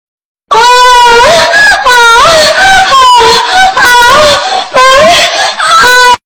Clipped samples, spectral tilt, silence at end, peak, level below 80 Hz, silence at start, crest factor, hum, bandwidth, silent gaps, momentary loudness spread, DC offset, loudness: 3%; -0.5 dB/octave; 0.1 s; 0 dBFS; -30 dBFS; 0.5 s; 4 dB; none; over 20 kHz; none; 4 LU; under 0.1%; -2 LUFS